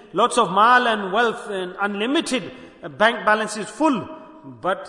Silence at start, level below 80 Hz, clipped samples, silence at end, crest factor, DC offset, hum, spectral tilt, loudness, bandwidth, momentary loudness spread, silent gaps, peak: 0.15 s; -62 dBFS; under 0.1%; 0 s; 18 dB; under 0.1%; none; -3.5 dB/octave; -20 LUFS; 11 kHz; 20 LU; none; -2 dBFS